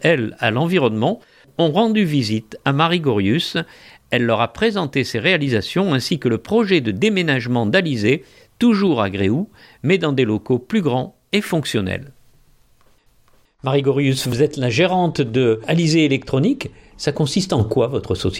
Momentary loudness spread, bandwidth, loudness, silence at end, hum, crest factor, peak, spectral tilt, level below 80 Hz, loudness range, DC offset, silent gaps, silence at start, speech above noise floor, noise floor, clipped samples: 6 LU; 16 kHz; -18 LUFS; 0 s; none; 18 dB; -2 dBFS; -6 dB/octave; -50 dBFS; 4 LU; under 0.1%; none; 0 s; 37 dB; -55 dBFS; under 0.1%